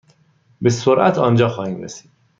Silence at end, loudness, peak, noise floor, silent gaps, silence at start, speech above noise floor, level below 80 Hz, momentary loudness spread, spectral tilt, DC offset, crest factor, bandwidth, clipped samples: 0.4 s; -17 LUFS; -2 dBFS; -56 dBFS; none; 0.6 s; 40 dB; -58 dBFS; 17 LU; -6.5 dB/octave; under 0.1%; 16 dB; 7.6 kHz; under 0.1%